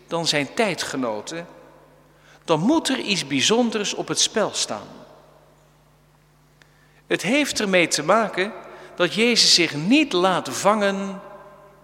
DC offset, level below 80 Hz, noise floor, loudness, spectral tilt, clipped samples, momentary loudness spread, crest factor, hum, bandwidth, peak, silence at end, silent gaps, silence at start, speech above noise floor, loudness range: under 0.1%; -64 dBFS; -56 dBFS; -20 LUFS; -3 dB/octave; under 0.1%; 13 LU; 20 dB; none; 16.5 kHz; -2 dBFS; 0.3 s; none; 0.1 s; 35 dB; 8 LU